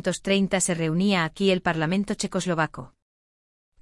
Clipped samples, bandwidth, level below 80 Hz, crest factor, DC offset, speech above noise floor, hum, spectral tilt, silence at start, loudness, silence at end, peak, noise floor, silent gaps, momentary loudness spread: under 0.1%; 12 kHz; -54 dBFS; 16 dB; under 0.1%; over 66 dB; none; -4.5 dB/octave; 0.05 s; -24 LUFS; 0.95 s; -8 dBFS; under -90 dBFS; none; 5 LU